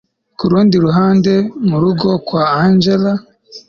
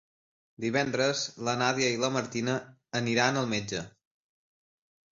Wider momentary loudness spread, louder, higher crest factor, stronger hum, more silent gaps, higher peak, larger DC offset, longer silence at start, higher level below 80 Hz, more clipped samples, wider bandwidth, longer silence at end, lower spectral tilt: second, 5 LU vs 10 LU; first, -13 LUFS vs -29 LUFS; second, 12 dB vs 22 dB; neither; neither; first, -2 dBFS vs -10 dBFS; neither; second, 0.4 s vs 0.6 s; first, -48 dBFS vs -66 dBFS; neither; second, 6.8 kHz vs 7.8 kHz; second, 0.1 s vs 1.25 s; first, -8 dB/octave vs -4 dB/octave